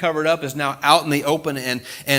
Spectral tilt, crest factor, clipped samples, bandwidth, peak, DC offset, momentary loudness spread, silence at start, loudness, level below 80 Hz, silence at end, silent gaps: -4 dB/octave; 20 dB; under 0.1%; 18 kHz; 0 dBFS; under 0.1%; 9 LU; 0 s; -20 LUFS; -62 dBFS; 0 s; none